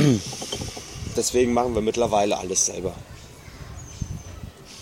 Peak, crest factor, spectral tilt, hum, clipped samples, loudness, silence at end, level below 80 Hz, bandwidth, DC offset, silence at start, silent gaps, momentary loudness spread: -6 dBFS; 20 dB; -4 dB/octave; none; under 0.1%; -24 LUFS; 0 s; -44 dBFS; 16.5 kHz; under 0.1%; 0 s; none; 20 LU